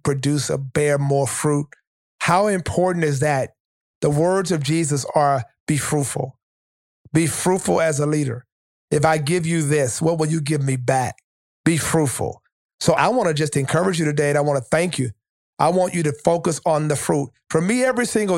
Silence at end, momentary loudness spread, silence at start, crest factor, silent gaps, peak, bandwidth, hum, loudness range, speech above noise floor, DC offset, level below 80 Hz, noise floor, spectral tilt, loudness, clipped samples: 0 s; 6 LU; 0.05 s; 20 dB; 1.87-2.18 s, 3.60-4.01 s, 5.60-5.67 s, 6.43-7.05 s, 8.52-8.88 s, 11.24-11.64 s, 12.52-12.78 s, 15.29-15.53 s; -2 dBFS; 16.5 kHz; none; 2 LU; over 71 dB; under 0.1%; -52 dBFS; under -90 dBFS; -5 dB/octave; -20 LUFS; under 0.1%